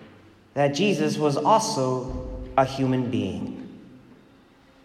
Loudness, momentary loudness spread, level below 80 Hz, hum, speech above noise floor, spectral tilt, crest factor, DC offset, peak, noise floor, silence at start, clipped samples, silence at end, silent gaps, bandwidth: -24 LUFS; 14 LU; -46 dBFS; none; 32 dB; -5.5 dB/octave; 20 dB; under 0.1%; -4 dBFS; -55 dBFS; 0 s; under 0.1%; 0.85 s; none; 15 kHz